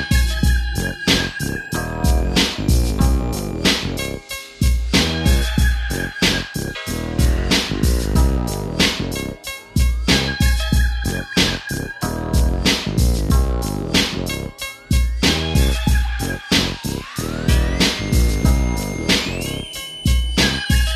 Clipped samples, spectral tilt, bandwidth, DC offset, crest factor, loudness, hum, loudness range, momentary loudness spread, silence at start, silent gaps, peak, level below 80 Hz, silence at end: under 0.1%; -4.5 dB/octave; 14 kHz; under 0.1%; 16 dB; -19 LUFS; none; 1 LU; 8 LU; 0 s; none; -2 dBFS; -22 dBFS; 0 s